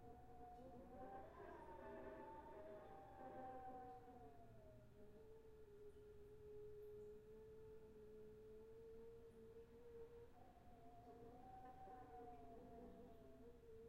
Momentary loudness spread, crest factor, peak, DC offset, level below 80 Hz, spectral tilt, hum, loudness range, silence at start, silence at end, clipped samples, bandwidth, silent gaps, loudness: 8 LU; 16 dB; -46 dBFS; under 0.1%; -72 dBFS; -6.5 dB/octave; none; 5 LU; 0 s; 0 s; under 0.1%; 8 kHz; none; -62 LUFS